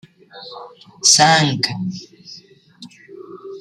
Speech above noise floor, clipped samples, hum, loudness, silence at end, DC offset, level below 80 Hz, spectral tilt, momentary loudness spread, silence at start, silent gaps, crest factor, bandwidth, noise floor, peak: 27 dB; under 0.1%; none; -14 LUFS; 0 s; under 0.1%; -64 dBFS; -2 dB/octave; 27 LU; 0.35 s; none; 20 dB; 15.5 kHz; -44 dBFS; 0 dBFS